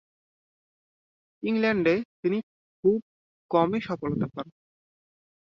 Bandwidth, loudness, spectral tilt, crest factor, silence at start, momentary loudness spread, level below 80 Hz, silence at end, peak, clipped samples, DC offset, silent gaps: 6.4 kHz; -27 LUFS; -8.5 dB/octave; 20 dB; 1.4 s; 10 LU; -64 dBFS; 0.95 s; -10 dBFS; under 0.1%; under 0.1%; 2.05-2.23 s, 2.43-2.83 s, 3.02-3.49 s